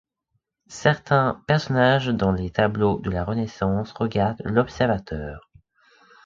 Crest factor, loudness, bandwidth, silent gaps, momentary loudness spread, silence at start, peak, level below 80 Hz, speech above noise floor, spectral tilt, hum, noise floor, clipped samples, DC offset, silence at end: 20 dB; -23 LUFS; 7.6 kHz; none; 9 LU; 0.7 s; -4 dBFS; -44 dBFS; 53 dB; -7 dB/octave; none; -75 dBFS; under 0.1%; under 0.1%; 0.85 s